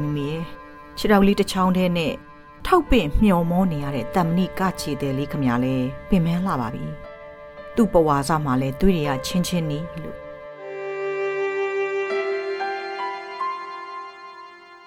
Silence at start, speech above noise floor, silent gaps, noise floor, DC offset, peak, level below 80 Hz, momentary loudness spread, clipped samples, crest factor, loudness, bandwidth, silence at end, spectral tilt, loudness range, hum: 0 s; 22 dB; none; -43 dBFS; under 0.1%; -4 dBFS; -36 dBFS; 18 LU; under 0.1%; 18 dB; -22 LUFS; 16.5 kHz; 0 s; -6.5 dB/octave; 6 LU; none